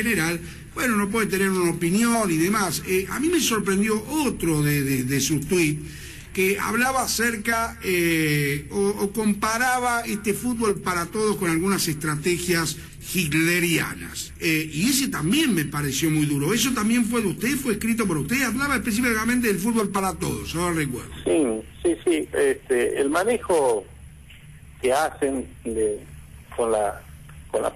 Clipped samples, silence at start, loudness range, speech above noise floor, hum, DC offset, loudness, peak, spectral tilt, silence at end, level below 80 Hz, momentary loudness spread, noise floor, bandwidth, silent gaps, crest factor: under 0.1%; 0 s; 2 LU; 22 dB; none; under 0.1%; -23 LUFS; -10 dBFS; -4.5 dB/octave; 0 s; -44 dBFS; 6 LU; -45 dBFS; 13.5 kHz; none; 12 dB